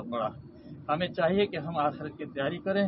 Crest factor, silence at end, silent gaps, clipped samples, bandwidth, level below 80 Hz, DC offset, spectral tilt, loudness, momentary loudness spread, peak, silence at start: 16 dB; 0 s; none; under 0.1%; 5.8 kHz; -60 dBFS; under 0.1%; -10 dB/octave; -30 LUFS; 15 LU; -14 dBFS; 0 s